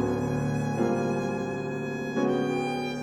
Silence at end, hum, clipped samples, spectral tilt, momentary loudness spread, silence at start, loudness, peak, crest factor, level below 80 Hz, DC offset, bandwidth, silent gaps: 0 s; none; under 0.1%; -7 dB/octave; 5 LU; 0 s; -28 LUFS; -14 dBFS; 14 dB; -54 dBFS; under 0.1%; 15 kHz; none